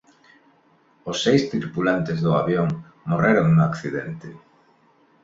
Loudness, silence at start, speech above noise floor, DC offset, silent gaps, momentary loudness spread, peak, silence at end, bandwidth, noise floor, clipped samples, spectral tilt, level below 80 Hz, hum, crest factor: -21 LUFS; 1.05 s; 38 dB; under 0.1%; none; 16 LU; -4 dBFS; 0.85 s; 7.8 kHz; -59 dBFS; under 0.1%; -6.5 dB/octave; -54 dBFS; none; 18 dB